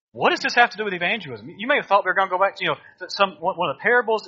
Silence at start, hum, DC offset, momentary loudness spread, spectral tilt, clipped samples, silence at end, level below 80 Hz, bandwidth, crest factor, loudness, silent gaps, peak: 0.15 s; none; under 0.1%; 9 LU; -1 dB/octave; under 0.1%; 0 s; -70 dBFS; 7.6 kHz; 20 dB; -21 LUFS; none; -2 dBFS